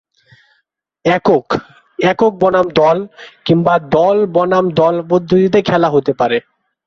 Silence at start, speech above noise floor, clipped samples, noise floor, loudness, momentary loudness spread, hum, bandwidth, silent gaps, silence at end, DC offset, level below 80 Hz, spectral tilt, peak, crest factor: 1.05 s; 53 dB; under 0.1%; -65 dBFS; -13 LUFS; 8 LU; none; 7.2 kHz; none; 0.45 s; under 0.1%; -50 dBFS; -7 dB/octave; 0 dBFS; 12 dB